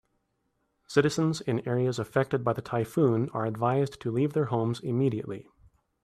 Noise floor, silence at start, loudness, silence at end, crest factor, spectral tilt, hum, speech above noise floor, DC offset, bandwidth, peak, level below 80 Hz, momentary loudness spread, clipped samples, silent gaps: -76 dBFS; 0.9 s; -28 LUFS; 0.65 s; 20 dB; -7 dB/octave; none; 49 dB; under 0.1%; 13.5 kHz; -8 dBFS; -64 dBFS; 5 LU; under 0.1%; none